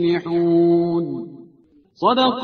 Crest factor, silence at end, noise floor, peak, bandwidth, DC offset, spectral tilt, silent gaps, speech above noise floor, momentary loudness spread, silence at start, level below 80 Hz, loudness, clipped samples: 16 dB; 0 s; -54 dBFS; -4 dBFS; 5 kHz; under 0.1%; -8 dB/octave; none; 36 dB; 14 LU; 0 s; -60 dBFS; -18 LUFS; under 0.1%